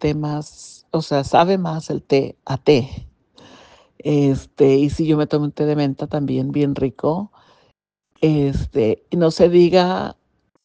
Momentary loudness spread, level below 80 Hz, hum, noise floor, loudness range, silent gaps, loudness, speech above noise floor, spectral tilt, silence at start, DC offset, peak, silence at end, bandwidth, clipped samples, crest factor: 11 LU; -42 dBFS; none; -66 dBFS; 3 LU; none; -18 LUFS; 48 dB; -7.5 dB/octave; 0 s; under 0.1%; 0 dBFS; 0.5 s; 9.2 kHz; under 0.1%; 18 dB